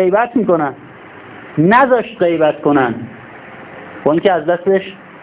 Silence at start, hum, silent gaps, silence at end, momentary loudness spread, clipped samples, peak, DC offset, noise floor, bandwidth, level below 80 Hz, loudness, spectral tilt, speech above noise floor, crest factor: 0 s; none; none; 0.05 s; 23 LU; under 0.1%; 0 dBFS; under 0.1%; -36 dBFS; 4 kHz; -54 dBFS; -14 LUFS; -10.5 dB/octave; 23 dB; 14 dB